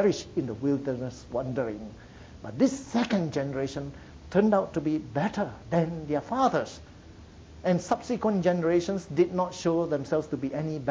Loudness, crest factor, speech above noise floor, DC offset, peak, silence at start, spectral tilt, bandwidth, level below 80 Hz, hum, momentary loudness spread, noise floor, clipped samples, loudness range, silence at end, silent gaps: -28 LUFS; 18 dB; 21 dB; under 0.1%; -10 dBFS; 0 s; -6.5 dB/octave; 8 kHz; -54 dBFS; none; 12 LU; -48 dBFS; under 0.1%; 3 LU; 0 s; none